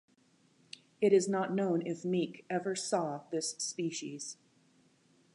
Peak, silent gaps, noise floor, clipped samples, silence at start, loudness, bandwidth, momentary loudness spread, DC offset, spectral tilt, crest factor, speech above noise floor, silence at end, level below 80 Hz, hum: -14 dBFS; none; -69 dBFS; under 0.1%; 1 s; -34 LUFS; 11 kHz; 17 LU; under 0.1%; -4.5 dB/octave; 20 dB; 36 dB; 1 s; -86 dBFS; none